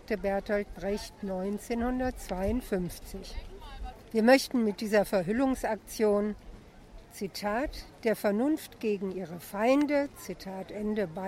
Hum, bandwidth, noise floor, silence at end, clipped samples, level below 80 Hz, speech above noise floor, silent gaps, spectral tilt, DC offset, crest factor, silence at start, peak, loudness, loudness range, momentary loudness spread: none; 16 kHz; -51 dBFS; 0 s; under 0.1%; -48 dBFS; 21 dB; none; -5.5 dB/octave; under 0.1%; 20 dB; 0.1 s; -10 dBFS; -30 LUFS; 5 LU; 16 LU